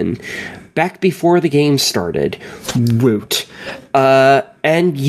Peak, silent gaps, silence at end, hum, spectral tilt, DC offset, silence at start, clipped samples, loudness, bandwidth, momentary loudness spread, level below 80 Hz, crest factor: 0 dBFS; none; 0 s; none; -5 dB/octave; under 0.1%; 0 s; under 0.1%; -15 LUFS; 15 kHz; 14 LU; -50 dBFS; 14 dB